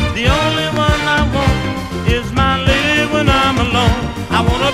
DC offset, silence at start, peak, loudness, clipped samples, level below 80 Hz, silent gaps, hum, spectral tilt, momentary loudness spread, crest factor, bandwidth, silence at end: under 0.1%; 0 s; 0 dBFS; -14 LUFS; under 0.1%; -24 dBFS; none; none; -5 dB/octave; 5 LU; 14 dB; 15.5 kHz; 0 s